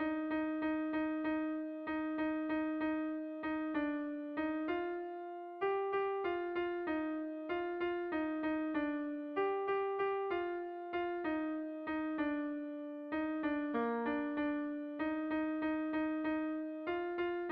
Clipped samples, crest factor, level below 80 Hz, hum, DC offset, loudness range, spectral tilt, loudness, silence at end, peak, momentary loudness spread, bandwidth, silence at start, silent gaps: under 0.1%; 14 dB; -70 dBFS; none; under 0.1%; 2 LU; -3 dB/octave; -38 LUFS; 0 s; -24 dBFS; 5 LU; 4.8 kHz; 0 s; none